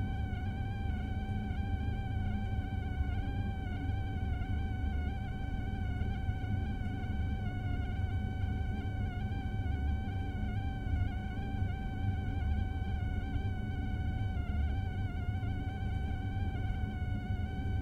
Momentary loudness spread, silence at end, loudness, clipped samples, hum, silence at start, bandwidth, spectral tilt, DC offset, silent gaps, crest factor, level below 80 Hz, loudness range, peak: 2 LU; 0 s; -37 LUFS; under 0.1%; none; 0 s; 6.4 kHz; -8.5 dB/octave; under 0.1%; none; 12 dB; -38 dBFS; 1 LU; -22 dBFS